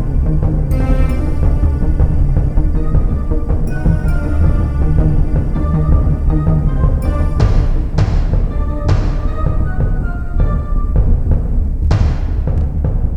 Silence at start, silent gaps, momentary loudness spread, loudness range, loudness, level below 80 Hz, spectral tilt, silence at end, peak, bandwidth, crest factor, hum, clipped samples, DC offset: 0 s; none; 4 LU; 2 LU; -16 LUFS; -14 dBFS; -9 dB/octave; 0 s; 0 dBFS; 6 kHz; 12 dB; none; under 0.1%; under 0.1%